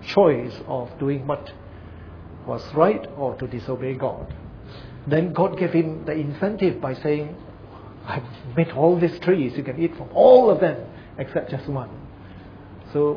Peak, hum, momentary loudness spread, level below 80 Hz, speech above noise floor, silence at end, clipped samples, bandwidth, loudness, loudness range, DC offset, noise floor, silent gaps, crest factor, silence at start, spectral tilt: -2 dBFS; none; 23 LU; -50 dBFS; 20 dB; 0 s; under 0.1%; 5.4 kHz; -22 LUFS; 7 LU; under 0.1%; -41 dBFS; none; 20 dB; 0 s; -9 dB/octave